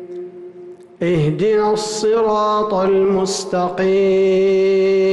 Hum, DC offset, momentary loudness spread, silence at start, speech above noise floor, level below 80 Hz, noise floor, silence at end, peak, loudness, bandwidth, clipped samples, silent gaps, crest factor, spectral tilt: none; under 0.1%; 13 LU; 0 s; 23 dB; -50 dBFS; -38 dBFS; 0 s; -8 dBFS; -16 LUFS; 12 kHz; under 0.1%; none; 8 dB; -5.5 dB/octave